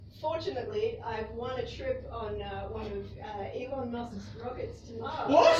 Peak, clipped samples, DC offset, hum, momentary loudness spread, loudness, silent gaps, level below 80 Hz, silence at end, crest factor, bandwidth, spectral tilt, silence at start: -10 dBFS; under 0.1%; under 0.1%; none; 7 LU; -35 LUFS; none; -52 dBFS; 0 s; 22 dB; 10 kHz; -5.5 dB/octave; 0 s